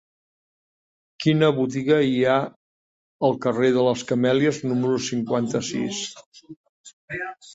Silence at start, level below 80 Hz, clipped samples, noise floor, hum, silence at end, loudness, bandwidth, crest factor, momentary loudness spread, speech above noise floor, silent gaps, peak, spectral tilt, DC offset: 1.2 s; -62 dBFS; under 0.1%; under -90 dBFS; none; 0 s; -22 LUFS; 8 kHz; 18 dB; 12 LU; over 68 dB; 2.56-3.19 s, 6.26-6.32 s, 6.56-6.84 s, 6.93-7.08 s; -6 dBFS; -5.5 dB/octave; under 0.1%